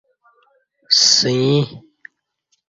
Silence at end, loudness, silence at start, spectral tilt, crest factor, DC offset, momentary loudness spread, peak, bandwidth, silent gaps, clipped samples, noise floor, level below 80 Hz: 0.9 s; -14 LUFS; 0.9 s; -3 dB/octave; 20 dB; under 0.1%; 9 LU; 0 dBFS; 7.8 kHz; none; under 0.1%; -68 dBFS; -60 dBFS